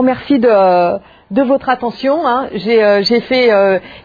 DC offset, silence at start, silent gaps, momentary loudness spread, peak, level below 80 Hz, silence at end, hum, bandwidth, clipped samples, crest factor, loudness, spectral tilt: under 0.1%; 0 s; none; 7 LU; 0 dBFS; -50 dBFS; 0.05 s; none; 5 kHz; under 0.1%; 12 dB; -12 LUFS; -6.5 dB/octave